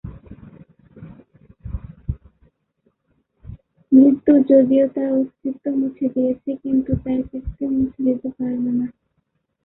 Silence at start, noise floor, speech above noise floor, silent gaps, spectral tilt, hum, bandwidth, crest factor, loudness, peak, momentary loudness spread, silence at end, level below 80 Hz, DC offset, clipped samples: 0.05 s; -71 dBFS; 53 dB; none; -13.5 dB/octave; none; 3.3 kHz; 18 dB; -19 LUFS; -2 dBFS; 19 LU; 0.75 s; -42 dBFS; under 0.1%; under 0.1%